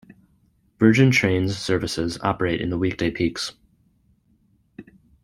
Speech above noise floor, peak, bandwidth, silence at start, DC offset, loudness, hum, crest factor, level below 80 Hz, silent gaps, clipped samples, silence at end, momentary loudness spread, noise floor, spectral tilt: 42 dB; -2 dBFS; 16 kHz; 0.8 s; under 0.1%; -21 LUFS; none; 22 dB; -50 dBFS; none; under 0.1%; 0.4 s; 9 LU; -62 dBFS; -6 dB/octave